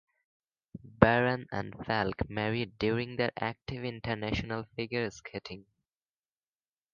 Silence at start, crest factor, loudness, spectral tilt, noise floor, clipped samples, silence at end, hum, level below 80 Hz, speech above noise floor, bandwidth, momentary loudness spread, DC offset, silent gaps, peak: 0.75 s; 28 dB; -32 LUFS; -7 dB/octave; under -90 dBFS; under 0.1%; 1.3 s; none; -52 dBFS; over 57 dB; 7.2 kHz; 17 LU; under 0.1%; none; -4 dBFS